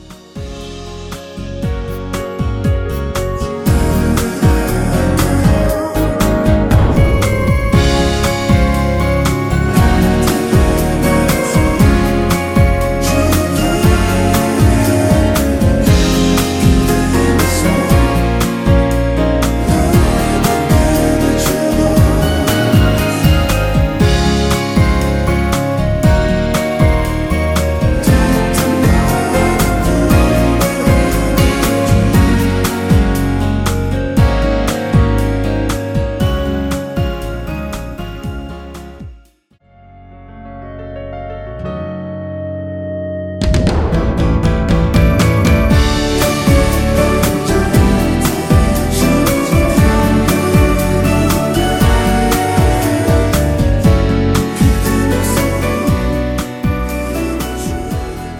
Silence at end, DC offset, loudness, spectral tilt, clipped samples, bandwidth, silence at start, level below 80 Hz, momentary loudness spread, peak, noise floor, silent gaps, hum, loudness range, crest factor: 0 s; under 0.1%; -13 LUFS; -6 dB/octave; under 0.1%; 17.5 kHz; 0 s; -18 dBFS; 11 LU; 0 dBFS; -51 dBFS; none; none; 8 LU; 12 dB